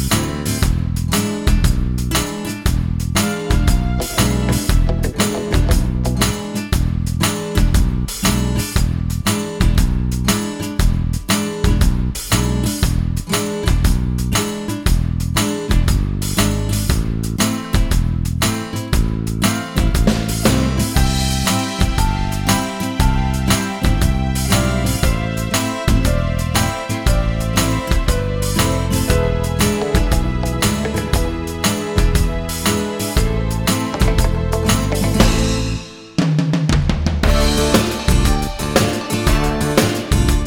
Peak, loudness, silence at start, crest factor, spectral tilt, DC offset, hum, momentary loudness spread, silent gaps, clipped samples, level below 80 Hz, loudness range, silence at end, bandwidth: 0 dBFS; -18 LUFS; 0 s; 16 dB; -5 dB/octave; under 0.1%; none; 4 LU; none; under 0.1%; -20 dBFS; 2 LU; 0 s; 18 kHz